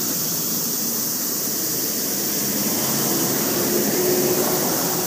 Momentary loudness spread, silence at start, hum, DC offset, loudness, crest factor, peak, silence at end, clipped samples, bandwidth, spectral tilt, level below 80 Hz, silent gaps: 2 LU; 0 s; none; under 0.1%; -19 LUFS; 16 dB; -6 dBFS; 0 s; under 0.1%; 15.5 kHz; -2.5 dB/octave; -60 dBFS; none